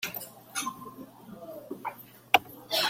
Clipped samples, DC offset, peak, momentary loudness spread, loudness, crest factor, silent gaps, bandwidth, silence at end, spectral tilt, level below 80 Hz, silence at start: under 0.1%; under 0.1%; -4 dBFS; 21 LU; -31 LUFS; 30 dB; none; 16.5 kHz; 0 s; -1 dB/octave; -72 dBFS; 0 s